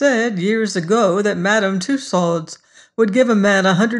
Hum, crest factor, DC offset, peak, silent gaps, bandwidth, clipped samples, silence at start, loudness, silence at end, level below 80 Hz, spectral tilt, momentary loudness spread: none; 14 dB; under 0.1%; -2 dBFS; none; 11 kHz; under 0.1%; 0 s; -16 LUFS; 0 s; -66 dBFS; -5 dB/octave; 7 LU